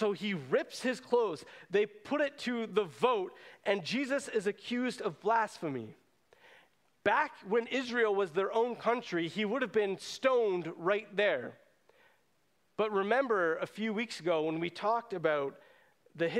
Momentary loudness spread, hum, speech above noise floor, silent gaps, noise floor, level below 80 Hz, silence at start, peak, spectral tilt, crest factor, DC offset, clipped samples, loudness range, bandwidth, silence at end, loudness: 6 LU; none; 43 dB; none; -75 dBFS; -80 dBFS; 0 s; -12 dBFS; -5 dB/octave; 20 dB; under 0.1%; under 0.1%; 3 LU; 13 kHz; 0 s; -33 LUFS